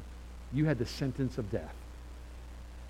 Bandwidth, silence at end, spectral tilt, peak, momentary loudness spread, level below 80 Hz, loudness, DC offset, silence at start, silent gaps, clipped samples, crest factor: 15 kHz; 0 s; -7 dB/octave; -16 dBFS; 18 LU; -46 dBFS; -34 LUFS; under 0.1%; 0 s; none; under 0.1%; 20 dB